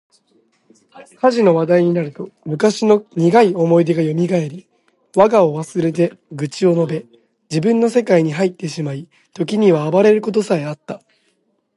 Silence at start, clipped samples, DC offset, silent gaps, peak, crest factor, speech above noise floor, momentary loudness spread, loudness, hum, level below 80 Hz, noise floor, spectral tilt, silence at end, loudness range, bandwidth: 0.95 s; under 0.1%; under 0.1%; none; 0 dBFS; 16 dB; 49 dB; 14 LU; -16 LUFS; none; -64 dBFS; -64 dBFS; -7 dB/octave; 0.8 s; 3 LU; 11.5 kHz